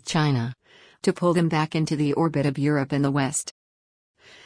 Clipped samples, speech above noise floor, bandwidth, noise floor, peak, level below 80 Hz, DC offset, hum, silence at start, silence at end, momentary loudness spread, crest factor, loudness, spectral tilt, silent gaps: under 0.1%; over 67 dB; 10.5 kHz; under -90 dBFS; -8 dBFS; -58 dBFS; under 0.1%; none; 0.05 s; 0.95 s; 6 LU; 16 dB; -24 LUFS; -5.5 dB/octave; none